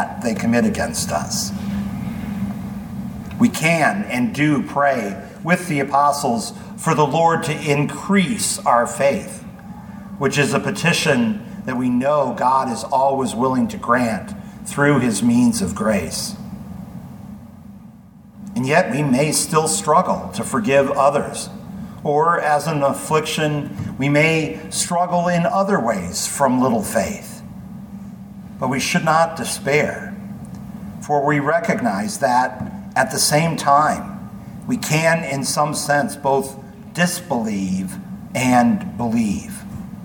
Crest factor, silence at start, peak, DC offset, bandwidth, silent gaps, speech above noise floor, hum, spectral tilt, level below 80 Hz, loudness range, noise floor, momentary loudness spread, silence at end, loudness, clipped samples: 18 dB; 0 s; -2 dBFS; under 0.1%; 19 kHz; none; 25 dB; none; -4.5 dB/octave; -48 dBFS; 3 LU; -43 dBFS; 17 LU; 0 s; -19 LUFS; under 0.1%